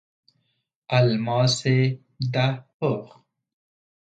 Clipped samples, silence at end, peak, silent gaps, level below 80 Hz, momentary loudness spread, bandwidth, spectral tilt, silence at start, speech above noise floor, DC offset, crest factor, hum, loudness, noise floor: under 0.1%; 1.05 s; -6 dBFS; 2.74-2.80 s; -64 dBFS; 7 LU; 9.2 kHz; -5.5 dB/octave; 0.9 s; 52 dB; under 0.1%; 18 dB; none; -23 LUFS; -74 dBFS